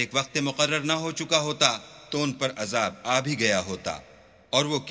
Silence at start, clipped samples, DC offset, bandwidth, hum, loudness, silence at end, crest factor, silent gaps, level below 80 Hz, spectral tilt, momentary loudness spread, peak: 0 s; under 0.1%; under 0.1%; 8 kHz; none; -25 LUFS; 0 s; 24 dB; none; -60 dBFS; -3 dB/octave; 10 LU; -4 dBFS